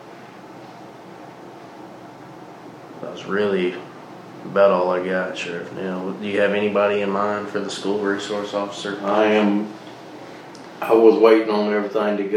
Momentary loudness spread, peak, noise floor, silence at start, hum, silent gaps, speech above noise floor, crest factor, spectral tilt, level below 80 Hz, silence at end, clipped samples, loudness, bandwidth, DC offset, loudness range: 24 LU; -2 dBFS; -40 dBFS; 0 s; none; none; 21 dB; 20 dB; -5.5 dB/octave; -74 dBFS; 0 s; under 0.1%; -20 LUFS; 14.5 kHz; under 0.1%; 10 LU